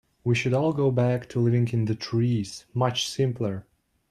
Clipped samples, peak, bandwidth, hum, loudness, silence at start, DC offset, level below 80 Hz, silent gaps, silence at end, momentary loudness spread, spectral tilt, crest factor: under 0.1%; -10 dBFS; 12.5 kHz; none; -25 LUFS; 0.25 s; under 0.1%; -60 dBFS; none; 0.5 s; 7 LU; -6.5 dB/octave; 16 dB